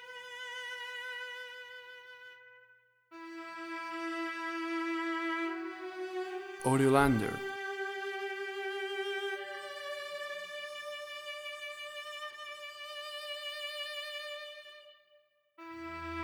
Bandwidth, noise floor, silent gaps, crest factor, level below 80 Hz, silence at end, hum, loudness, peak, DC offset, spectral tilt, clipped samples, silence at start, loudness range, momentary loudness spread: over 20 kHz; -69 dBFS; none; 26 dB; -60 dBFS; 0 s; none; -37 LUFS; -12 dBFS; under 0.1%; -5 dB/octave; under 0.1%; 0 s; 11 LU; 14 LU